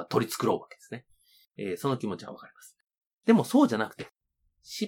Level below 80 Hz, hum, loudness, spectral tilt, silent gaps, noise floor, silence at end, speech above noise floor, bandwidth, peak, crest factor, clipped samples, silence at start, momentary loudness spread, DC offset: -76 dBFS; none; -28 LUFS; -5.5 dB/octave; 3.07-3.18 s; -75 dBFS; 0 s; 47 dB; 18 kHz; -6 dBFS; 22 dB; under 0.1%; 0 s; 21 LU; under 0.1%